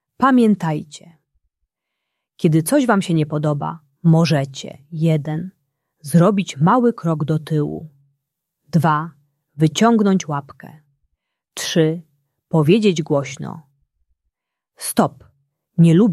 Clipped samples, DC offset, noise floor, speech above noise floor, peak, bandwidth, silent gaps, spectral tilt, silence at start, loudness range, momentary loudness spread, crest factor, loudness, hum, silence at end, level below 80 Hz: under 0.1%; under 0.1%; -79 dBFS; 62 dB; -2 dBFS; 13 kHz; none; -6.5 dB/octave; 0.2 s; 2 LU; 16 LU; 18 dB; -18 LUFS; none; 0 s; -60 dBFS